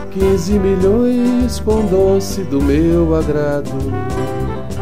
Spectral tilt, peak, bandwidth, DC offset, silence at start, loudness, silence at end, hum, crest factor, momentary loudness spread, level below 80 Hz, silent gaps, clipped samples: -7 dB/octave; -4 dBFS; 16 kHz; 5%; 0 s; -15 LUFS; 0 s; none; 12 dB; 8 LU; -26 dBFS; none; under 0.1%